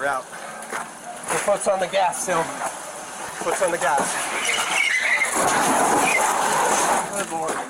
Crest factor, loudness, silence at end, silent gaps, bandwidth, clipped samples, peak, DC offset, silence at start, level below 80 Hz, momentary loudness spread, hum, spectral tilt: 12 dB; -21 LUFS; 0 s; none; 17 kHz; under 0.1%; -10 dBFS; under 0.1%; 0 s; -60 dBFS; 13 LU; none; -1.5 dB/octave